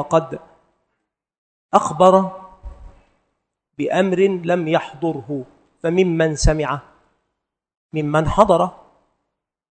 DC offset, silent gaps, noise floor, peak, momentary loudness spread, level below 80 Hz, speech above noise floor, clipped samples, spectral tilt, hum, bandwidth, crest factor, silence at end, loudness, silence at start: under 0.1%; 1.38-1.69 s, 7.77-7.90 s; -78 dBFS; 0 dBFS; 15 LU; -34 dBFS; 60 dB; under 0.1%; -6 dB/octave; none; 9.2 kHz; 20 dB; 1.05 s; -18 LUFS; 0 s